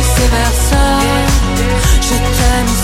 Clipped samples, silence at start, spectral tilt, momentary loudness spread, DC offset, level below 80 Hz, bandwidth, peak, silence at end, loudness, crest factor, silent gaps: under 0.1%; 0 s; -4 dB/octave; 2 LU; under 0.1%; -14 dBFS; 16.5 kHz; 0 dBFS; 0 s; -12 LUFS; 10 dB; none